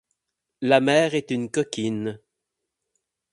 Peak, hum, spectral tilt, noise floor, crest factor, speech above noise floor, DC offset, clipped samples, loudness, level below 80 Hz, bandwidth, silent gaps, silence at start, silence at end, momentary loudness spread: -2 dBFS; none; -5 dB/octave; -82 dBFS; 24 dB; 60 dB; under 0.1%; under 0.1%; -23 LUFS; -68 dBFS; 11.5 kHz; none; 0.6 s; 1.15 s; 12 LU